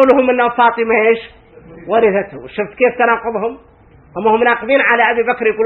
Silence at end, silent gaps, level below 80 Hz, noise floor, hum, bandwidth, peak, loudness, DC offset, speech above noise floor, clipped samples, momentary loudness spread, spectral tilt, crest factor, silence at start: 0 s; none; -50 dBFS; -37 dBFS; none; 4.3 kHz; 0 dBFS; -14 LUFS; under 0.1%; 24 dB; under 0.1%; 12 LU; -7.5 dB/octave; 14 dB; 0 s